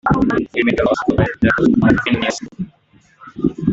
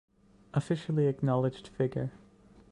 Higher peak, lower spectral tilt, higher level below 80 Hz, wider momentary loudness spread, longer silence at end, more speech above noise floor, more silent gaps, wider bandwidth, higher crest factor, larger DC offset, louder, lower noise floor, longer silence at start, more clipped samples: first, -2 dBFS vs -16 dBFS; second, -6.5 dB/octave vs -8.5 dB/octave; first, -36 dBFS vs -62 dBFS; first, 16 LU vs 7 LU; second, 0 s vs 0.55 s; first, 38 dB vs 28 dB; neither; second, 8 kHz vs 10.5 kHz; about the same, 14 dB vs 16 dB; neither; first, -16 LUFS vs -32 LUFS; second, -53 dBFS vs -58 dBFS; second, 0.05 s vs 0.55 s; neither